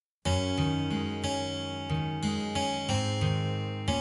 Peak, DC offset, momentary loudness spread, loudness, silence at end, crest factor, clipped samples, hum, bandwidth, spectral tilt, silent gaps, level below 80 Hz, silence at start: -14 dBFS; under 0.1%; 4 LU; -31 LUFS; 0 s; 16 dB; under 0.1%; none; 11.5 kHz; -5 dB/octave; none; -48 dBFS; 0.25 s